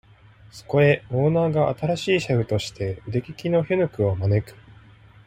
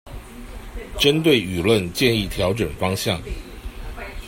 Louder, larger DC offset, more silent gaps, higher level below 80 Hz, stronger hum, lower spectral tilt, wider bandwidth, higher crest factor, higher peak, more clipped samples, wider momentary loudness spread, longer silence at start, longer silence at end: second, -23 LUFS vs -20 LUFS; neither; neither; second, -52 dBFS vs -36 dBFS; neither; first, -7 dB/octave vs -5 dB/octave; about the same, 15 kHz vs 16.5 kHz; about the same, 18 dB vs 20 dB; about the same, -4 dBFS vs -2 dBFS; neither; second, 9 LU vs 20 LU; first, 0.55 s vs 0.05 s; first, 0.75 s vs 0 s